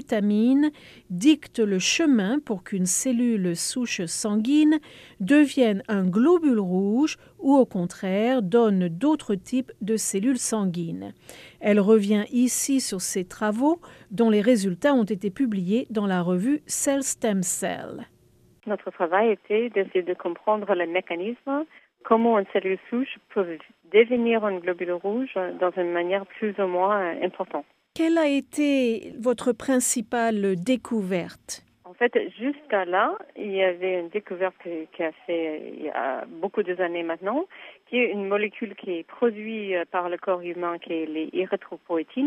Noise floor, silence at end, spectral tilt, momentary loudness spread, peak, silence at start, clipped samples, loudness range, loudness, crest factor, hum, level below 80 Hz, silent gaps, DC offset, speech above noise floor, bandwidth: -58 dBFS; 0 s; -4.5 dB/octave; 11 LU; -6 dBFS; 0 s; under 0.1%; 5 LU; -24 LUFS; 18 dB; none; -68 dBFS; none; under 0.1%; 34 dB; 15 kHz